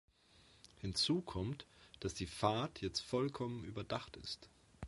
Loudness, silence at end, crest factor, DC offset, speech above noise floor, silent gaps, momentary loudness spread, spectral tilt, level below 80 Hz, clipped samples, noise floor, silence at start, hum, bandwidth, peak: -41 LUFS; 0 s; 24 dB; under 0.1%; 27 dB; none; 12 LU; -5 dB/octave; -60 dBFS; under 0.1%; -68 dBFS; 0.75 s; none; 11.5 kHz; -18 dBFS